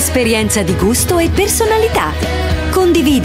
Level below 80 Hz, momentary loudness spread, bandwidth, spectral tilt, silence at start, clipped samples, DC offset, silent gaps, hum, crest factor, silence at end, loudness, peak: -24 dBFS; 5 LU; 16.5 kHz; -4.5 dB/octave; 0 s; under 0.1%; under 0.1%; none; none; 12 dB; 0 s; -13 LUFS; -2 dBFS